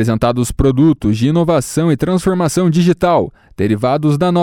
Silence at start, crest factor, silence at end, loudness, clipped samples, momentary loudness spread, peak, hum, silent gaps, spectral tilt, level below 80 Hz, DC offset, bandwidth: 0 s; 10 dB; 0 s; -14 LUFS; under 0.1%; 4 LU; -2 dBFS; none; none; -7 dB/octave; -32 dBFS; under 0.1%; 16.5 kHz